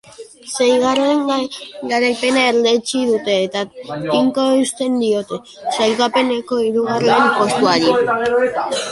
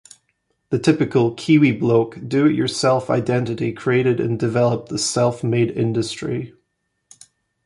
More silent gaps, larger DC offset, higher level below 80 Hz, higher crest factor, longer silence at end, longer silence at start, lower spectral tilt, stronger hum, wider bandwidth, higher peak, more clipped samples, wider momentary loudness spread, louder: neither; neither; about the same, -58 dBFS vs -56 dBFS; about the same, 14 dB vs 16 dB; second, 0 s vs 1.15 s; second, 0.2 s vs 0.7 s; second, -3.5 dB/octave vs -6 dB/octave; neither; about the same, 11.5 kHz vs 11.5 kHz; about the same, -2 dBFS vs -4 dBFS; neither; about the same, 10 LU vs 8 LU; first, -16 LUFS vs -19 LUFS